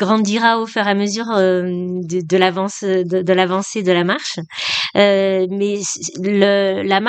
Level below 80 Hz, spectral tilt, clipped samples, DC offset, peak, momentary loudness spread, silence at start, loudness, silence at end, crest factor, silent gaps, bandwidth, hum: -64 dBFS; -4.5 dB/octave; under 0.1%; under 0.1%; 0 dBFS; 8 LU; 0 s; -17 LUFS; 0 s; 16 dB; none; 9 kHz; none